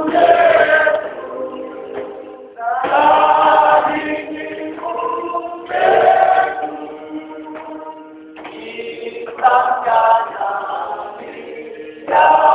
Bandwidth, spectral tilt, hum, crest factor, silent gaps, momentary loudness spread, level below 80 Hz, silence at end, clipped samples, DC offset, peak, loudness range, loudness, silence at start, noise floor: 4 kHz; -7.5 dB/octave; none; 16 dB; none; 20 LU; -58 dBFS; 0 s; under 0.1%; under 0.1%; 0 dBFS; 4 LU; -15 LUFS; 0 s; -35 dBFS